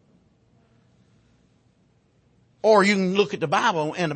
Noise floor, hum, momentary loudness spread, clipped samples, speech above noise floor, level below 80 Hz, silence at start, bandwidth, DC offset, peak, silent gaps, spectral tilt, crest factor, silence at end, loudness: -63 dBFS; none; 7 LU; under 0.1%; 42 dB; -70 dBFS; 2.65 s; 8.8 kHz; under 0.1%; -4 dBFS; none; -5 dB/octave; 20 dB; 0 s; -21 LUFS